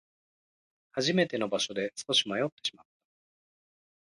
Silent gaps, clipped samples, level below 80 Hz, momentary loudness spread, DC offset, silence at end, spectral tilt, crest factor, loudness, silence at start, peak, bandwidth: 2.52-2.57 s; under 0.1%; -74 dBFS; 10 LU; under 0.1%; 1.35 s; -3.5 dB/octave; 20 dB; -30 LUFS; 0.95 s; -12 dBFS; 11.5 kHz